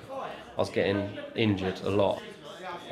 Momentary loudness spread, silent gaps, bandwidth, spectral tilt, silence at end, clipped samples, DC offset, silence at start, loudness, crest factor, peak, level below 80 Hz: 13 LU; none; 13.5 kHz; -6.5 dB/octave; 0 s; under 0.1%; under 0.1%; 0 s; -30 LUFS; 20 dB; -10 dBFS; -62 dBFS